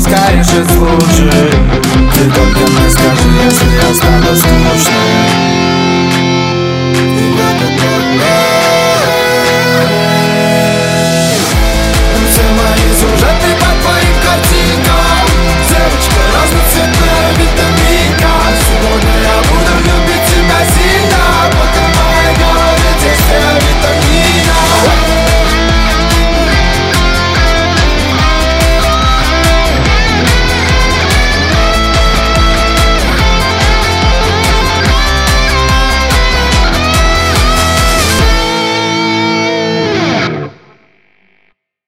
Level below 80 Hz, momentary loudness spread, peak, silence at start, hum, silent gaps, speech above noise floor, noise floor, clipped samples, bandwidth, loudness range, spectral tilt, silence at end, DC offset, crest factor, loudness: -14 dBFS; 2 LU; 0 dBFS; 0 s; none; none; 49 dB; -55 dBFS; under 0.1%; 16.5 kHz; 2 LU; -4 dB/octave; 1.35 s; 0.3%; 8 dB; -9 LUFS